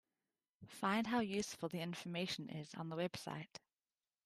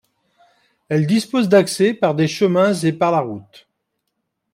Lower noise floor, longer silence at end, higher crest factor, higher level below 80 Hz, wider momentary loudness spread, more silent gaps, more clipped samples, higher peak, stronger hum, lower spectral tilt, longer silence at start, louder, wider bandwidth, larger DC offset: first, under -90 dBFS vs -75 dBFS; second, 0.8 s vs 1.1 s; about the same, 18 dB vs 16 dB; second, -80 dBFS vs -64 dBFS; first, 12 LU vs 7 LU; neither; neither; second, -24 dBFS vs -4 dBFS; neither; second, -4.5 dB/octave vs -6 dB/octave; second, 0.6 s vs 0.9 s; second, -42 LUFS vs -17 LUFS; second, 14.5 kHz vs 16 kHz; neither